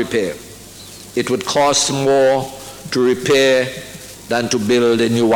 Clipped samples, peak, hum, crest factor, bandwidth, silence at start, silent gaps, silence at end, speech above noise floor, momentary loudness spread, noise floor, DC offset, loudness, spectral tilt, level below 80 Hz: under 0.1%; -4 dBFS; none; 14 dB; 17.5 kHz; 0 s; none; 0 s; 21 dB; 19 LU; -37 dBFS; under 0.1%; -16 LUFS; -3.5 dB/octave; -50 dBFS